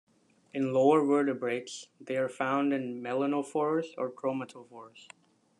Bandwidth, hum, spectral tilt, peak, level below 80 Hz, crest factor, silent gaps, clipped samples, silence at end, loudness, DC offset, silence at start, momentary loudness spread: 10.5 kHz; none; -6 dB/octave; -12 dBFS; -84 dBFS; 18 dB; none; under 0.1%; 0.6 s; -30 LUFS; under 0.1%; 0.55 s; 19 LU